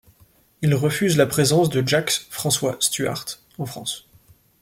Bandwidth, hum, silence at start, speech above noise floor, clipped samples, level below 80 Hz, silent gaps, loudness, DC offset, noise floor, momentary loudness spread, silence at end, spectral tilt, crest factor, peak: 16.5 kHz; none; 0.6 s; 36 dB; under 0.1%; -56 dBFS; none; -21 LUFS; under 0.1%; -57 dBFS; 13 LU; 0.65 s; -4 dB/octave; 20 dB; -2 dBFS